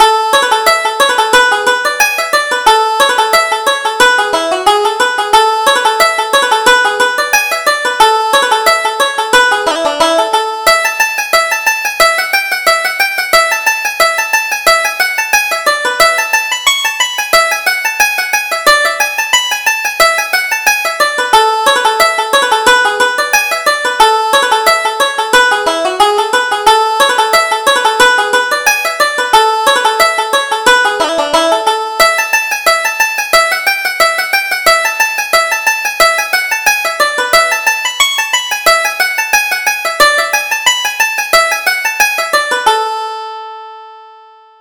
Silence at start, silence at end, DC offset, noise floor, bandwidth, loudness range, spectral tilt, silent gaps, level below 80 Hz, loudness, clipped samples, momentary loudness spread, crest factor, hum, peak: 0 s; 0.5 s; under 0.1%; -39 dBFS; over 20 kHz; 1 LU; 1 dB/octave; none; -46 dBFS; -10 LUFS; 0.2%; 4 LU; 10 dB; none; 0 dBFS